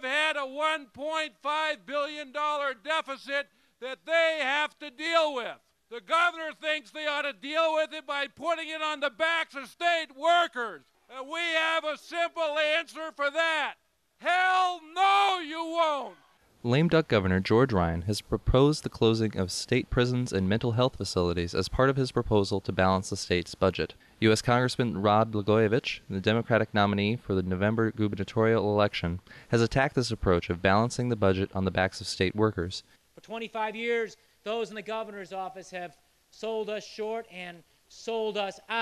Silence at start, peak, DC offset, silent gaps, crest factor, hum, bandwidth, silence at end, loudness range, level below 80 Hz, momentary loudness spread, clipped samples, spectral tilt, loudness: 0 s; -12 dBFS; under 0.1%; none; 16 dB; none; 13.5 kHz; 0 s; 6 LU; -50 dBFS; 11 LU; under 0.1%; -5.5 dB/octave; -28 LUFS